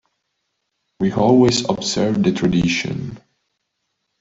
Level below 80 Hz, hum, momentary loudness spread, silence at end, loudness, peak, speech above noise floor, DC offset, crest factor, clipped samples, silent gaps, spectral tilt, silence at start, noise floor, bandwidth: -48 dBFS; none; 12 LU; 1 s; -17 LUFS; -4 dBFS; 57 dB; under 0.1%; 16 dB; under 0.1%; none; -5.5 dB/octave; 1 s; -74 dBFS; 8 kHz